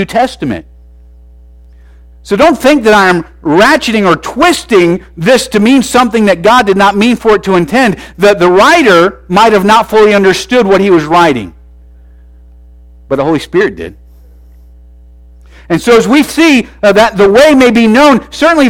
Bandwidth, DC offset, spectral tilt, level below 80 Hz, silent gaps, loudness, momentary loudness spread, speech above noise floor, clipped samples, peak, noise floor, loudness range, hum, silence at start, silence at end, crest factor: 17 kHz; under 0.1%; -5 dB/octave; -36 dBFS; none; -7 LUFS; 8 LU; 29 dB; 0.3%; 0 dBFS; -36 dBFS; 10 LU; none; 0 s; 0 s; 8 dB